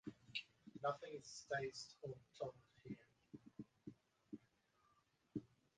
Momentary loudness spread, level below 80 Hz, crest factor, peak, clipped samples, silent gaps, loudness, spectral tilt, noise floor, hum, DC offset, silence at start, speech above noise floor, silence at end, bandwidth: 16 LU; -82 dBFS; 24 dB; -30 dBFS; under 0.1%; none; -51 LUFS; -4.5 dB/octave; -80 dBFS; none; under 0.1%; 0.05 s; 31 dB; 0.3 s; 9.4 kHz